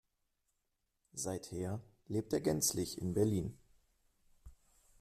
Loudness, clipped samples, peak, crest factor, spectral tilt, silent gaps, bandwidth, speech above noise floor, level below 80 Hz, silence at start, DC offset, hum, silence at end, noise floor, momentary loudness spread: -37 LUFS; under 0.1%; -20 dBFS; 20 dB; -5 dB/octave; none; 15.5 kHz; 47 dB; -64 dBFS; 1.15 s; under 0.1%; none; 0.45 s; -84 dBFS; 11 LU